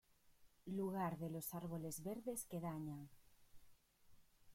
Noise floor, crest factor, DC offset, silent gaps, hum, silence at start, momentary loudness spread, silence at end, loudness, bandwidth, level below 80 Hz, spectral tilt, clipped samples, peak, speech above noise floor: -70 dBFS; 16 dB; under 0.1%; none; none; 0.25 s; 9 LU; 0 s; -47 LUFS; 16.5 kHz; -74 dBFS; -6 dB/octave; under 0.1%; -32 dBFS; 24 dB